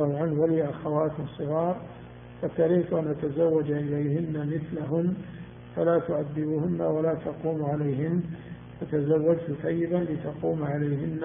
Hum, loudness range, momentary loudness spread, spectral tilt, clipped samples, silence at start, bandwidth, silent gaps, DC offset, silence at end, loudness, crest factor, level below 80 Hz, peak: 60 Hz at -50 dBFS; 1 LU; 12 LU; -9 dB/octave; under 0.1%; 0 s; 3.7 kHz; none; under 0.1%; 0 s; -28 LUFS; 16 dB; -58 dBFS; -12 dBFS